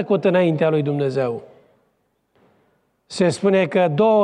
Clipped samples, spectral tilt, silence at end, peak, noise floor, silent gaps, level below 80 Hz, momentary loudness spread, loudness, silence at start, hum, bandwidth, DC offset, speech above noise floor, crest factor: under 0.1%; -7 dB/octave; 0 s; -6 dBFS; -67 dBFS; none; -68 dBFS; 8 LU; -19 LUFS; 0 s; none; 10.5 kHz; under 0.1%; 50 dB; 14 dB